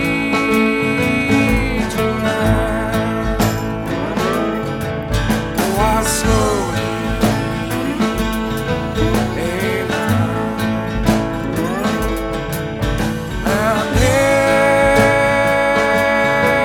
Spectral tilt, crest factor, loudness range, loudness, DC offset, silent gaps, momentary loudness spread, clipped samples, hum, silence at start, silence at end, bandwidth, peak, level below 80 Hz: -5 dB/octave; 16 dB; 5 LU; -17 LUFS; under 0.1%; none; 8 LU; under 0.1%; none; 0 s; 0 s; 18.5 kHz; 0 dBFS; -28 dBFS